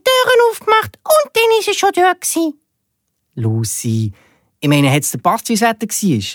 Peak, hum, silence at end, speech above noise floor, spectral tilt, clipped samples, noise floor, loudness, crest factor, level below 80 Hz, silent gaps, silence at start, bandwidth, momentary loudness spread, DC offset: 0 dBFS; none; 0 s; 55 dB; -4 dB/octave; under 0.1%; -71 dBFS; -15 LUFS; 16 dB; -58 dBFS; none; 0.05 s; 19.5 kHz; 9 LU; under 0.1%